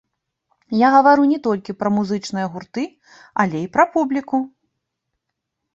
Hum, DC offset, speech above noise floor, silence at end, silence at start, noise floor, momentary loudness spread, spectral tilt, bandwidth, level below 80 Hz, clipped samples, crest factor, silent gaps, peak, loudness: none; under 0.1%; 61 dB; 1.25 s; 0.7 s; -79 dBFS; 15 LU; -6.5 dB/octave; 7.8 kHz; -64 dBFS; under 0.1%; 18 dB; none; -2 dBFS; -18 LUFS